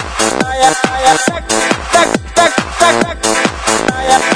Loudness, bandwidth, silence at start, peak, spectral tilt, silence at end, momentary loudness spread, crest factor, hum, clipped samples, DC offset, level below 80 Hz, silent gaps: -12 LUFS; 11 kHz; 0 s; 0 dBFS; -2.5 dB/octave; 0 s; 3 LU; 12 dB; none; 0.4%; 0.2%; -32 dBFS; none